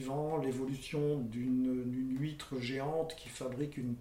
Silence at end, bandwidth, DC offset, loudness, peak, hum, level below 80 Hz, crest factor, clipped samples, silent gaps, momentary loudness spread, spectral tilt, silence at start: 0 s; 15.5 kHz; under 0.1%; -37 LUFS; -22 dBFS; none; -62 dBFS; 14 dB; under 0.1%; none; 6 LU; -6.5 dB/octave; 0 s